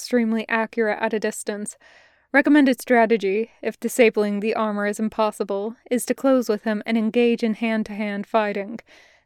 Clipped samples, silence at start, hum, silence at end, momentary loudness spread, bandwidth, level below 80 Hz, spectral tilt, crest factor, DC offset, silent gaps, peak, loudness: under 0.1%; 0 s; none; 0.5 s; 11 LU; 15.5 kHz; -66 dBFS; -5 dB/octave; 18 dB; under 0.1%; none; -4 dBFS; -22 LUFS